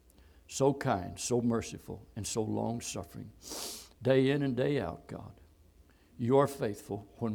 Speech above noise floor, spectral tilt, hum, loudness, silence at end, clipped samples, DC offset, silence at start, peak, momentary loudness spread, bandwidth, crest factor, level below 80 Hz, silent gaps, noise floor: 30 dB; -5.5 dB/octave; none; -33 LUFS; 0 s; under 0.1%; under 0.1%; 0.5 s; -12 dBFS; 17 LU; 19.5 kHz; 20 dB; -60 dBFS; none; -62 dBFS